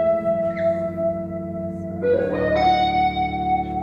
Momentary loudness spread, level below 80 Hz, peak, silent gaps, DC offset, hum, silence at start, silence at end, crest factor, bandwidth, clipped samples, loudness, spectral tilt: 11 LU; -42 dBFS; -8 dBFS; none; under 0.1%; none; 0 s; 0 s; 14 dB; 7 kHz; under 0.1%; -22 LUFS; -7.5 dB/octave